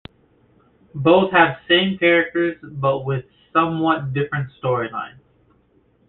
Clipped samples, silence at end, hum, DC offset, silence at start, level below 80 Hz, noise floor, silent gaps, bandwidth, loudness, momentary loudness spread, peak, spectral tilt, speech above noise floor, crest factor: under 0.1%; 1 s; none; under 0.1%; 0.95 s; -56 dBFS; -59 dBFS; none; 4.2 kHz; -19 LUFS; 12 LU; -2 dBFS; -9.5 dB/octave; 40 dB; 18 dB